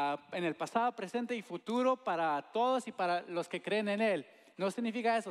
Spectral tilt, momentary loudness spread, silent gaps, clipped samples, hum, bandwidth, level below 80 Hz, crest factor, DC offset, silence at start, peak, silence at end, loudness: -5 dB/octave; 7 LU; none; under 0.1%; none; 13 kHz; under -90 dBFS; 16 dB; under 0.1%; 0 s; -18 dBFS; 0 s; -35 LUFS